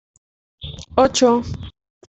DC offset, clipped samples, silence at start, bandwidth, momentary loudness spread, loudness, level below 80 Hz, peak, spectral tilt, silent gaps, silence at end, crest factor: under 0.1%; under 0.1%; 0.6 s; 8.2 kHz; 22 LU; -17 LUFS; -44 dBFS; -2 dBFS; -4.5 dB/octave; none; 0.4 s; 20 dB